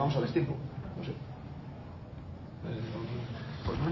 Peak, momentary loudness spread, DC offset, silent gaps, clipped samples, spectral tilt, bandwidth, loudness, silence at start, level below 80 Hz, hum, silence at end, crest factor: -16 dBFS; 14 LU; under 0.1%; none; under 0.1%; -8.5 dB/octave; 6 kHz; -38 LUFS; 0 s; -50 dBFS; none; 0 s; 18 dB